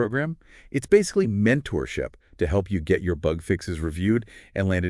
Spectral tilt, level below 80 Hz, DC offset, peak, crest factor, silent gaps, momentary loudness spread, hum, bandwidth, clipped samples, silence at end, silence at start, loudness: -6.5 dB/octave; -42 dBFS; under 0.1%; -4 dBFS; 20 dB; none; 11 LU; none; 12 kHz; under 0.1%; 0 s; 0 s; -25 LUFS